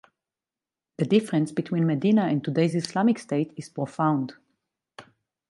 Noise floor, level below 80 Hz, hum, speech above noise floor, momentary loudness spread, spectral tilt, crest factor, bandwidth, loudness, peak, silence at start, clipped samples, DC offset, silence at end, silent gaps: under -90 dBFS; -72 dBFS; none; over 66 dB; 10 LU; -7 dB/octave; 18 dB; 11.5 kHz; -25 LUFS; -8 dBFS; 1 s; under 0.1%; under 0.1%; 0.5 s; none